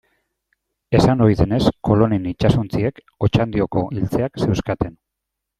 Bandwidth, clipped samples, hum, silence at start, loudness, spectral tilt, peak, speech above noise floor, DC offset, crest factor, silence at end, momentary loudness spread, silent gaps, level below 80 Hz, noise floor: 12.5 kHz; under 0.1%; none; 0.9 s; -19 LUFS; -8 dB/octave; 0 dBFS; 63 dB; under 0.1%; 18 dB; 0.7 s; 7 LU; none; -38 dBFS; -81 dBFS